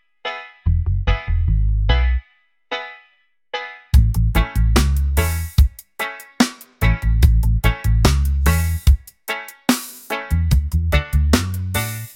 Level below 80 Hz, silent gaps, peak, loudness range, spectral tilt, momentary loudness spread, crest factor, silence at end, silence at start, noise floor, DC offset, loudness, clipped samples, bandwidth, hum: -20 dBFS; none; 0 dBFS; 4 LU; -5.5 dB/octave; 11 LU; 18 dB; 0.05 s; 0.25 s; -60 dBFS; under 0.1%; -20 LUFS; under 0.1%; 17 kHz; none